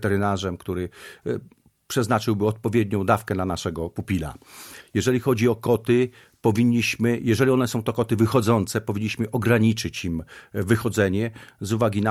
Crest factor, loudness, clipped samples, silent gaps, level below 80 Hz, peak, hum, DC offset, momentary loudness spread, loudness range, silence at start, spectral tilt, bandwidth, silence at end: 18 dB; -23 LUFS; under 0.1%; none; -50 dBFS; -4 dBFS; none; under 0.1%; 11 LU; 3 LU; 0 s; -6 dB/octave; 15.5 kHz; 0 s